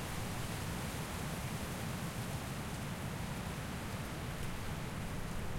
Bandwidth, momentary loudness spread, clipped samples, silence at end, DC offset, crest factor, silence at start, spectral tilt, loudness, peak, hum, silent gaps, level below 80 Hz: 16.5 kHz; 2 LU; under 0.1%; 0 s; under 0.1%; 12 dB; 0 s; -4.5 dB/octave; -41 LUFS; -28 dBFS; none; none; -50 dBFS